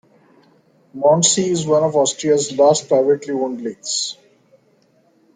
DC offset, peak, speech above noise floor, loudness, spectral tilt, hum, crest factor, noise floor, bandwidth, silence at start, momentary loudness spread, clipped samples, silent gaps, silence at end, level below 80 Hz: under 0.1%; -2 dBFS; 41 dB; -17 LUFS; -3.5 dB/octave; none; 18 dB; -58 dBFS; 9.6 kHz; 0.95 s; 9 LU; under 0.1%; none; 1.25 s; -64 dBFS